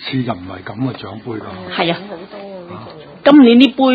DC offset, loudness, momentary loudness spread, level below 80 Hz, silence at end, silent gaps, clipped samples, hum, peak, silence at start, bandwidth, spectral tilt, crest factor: under 0.1%; -13 LUFS; 23 LU; -52 dBFS; 0 s; none; under 0.1%; none; 0 dBFS; 0 s; 5 kHz; -7.5 dB/octave; 14 dB